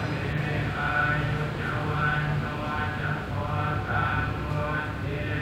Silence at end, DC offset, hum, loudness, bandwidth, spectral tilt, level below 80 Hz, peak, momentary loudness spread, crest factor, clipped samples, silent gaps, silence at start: 0 s; under 0.1%; none; -28 LUFS; 15 kHz; -7 dB/octave; -40 dBFS; -14 dBFS; 5 LU; 14 dB; under 0.1%; none; 0 s